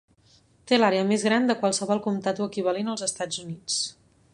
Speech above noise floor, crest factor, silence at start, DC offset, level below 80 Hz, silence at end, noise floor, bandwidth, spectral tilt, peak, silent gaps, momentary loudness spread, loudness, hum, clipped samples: 35 dB; 20 dB; 0.65 s; under 0.1%; -68 dBFS; 0.4 s; -60 dBFS; 11.5 kHz; -3.5 dB/octave; -6 dBFS; none; 9 LU; -25 LUFS; none; under 0.1%